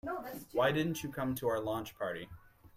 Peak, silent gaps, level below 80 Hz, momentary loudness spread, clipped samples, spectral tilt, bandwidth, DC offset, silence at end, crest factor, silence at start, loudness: -18 dBFS; none; -64 dBFS; 11 LU; under 0.1%; -5.5 dB/octave; 16 kHz; under 0.1%; 0.1 s; 18 dB; 0.05 s; -36 LUFS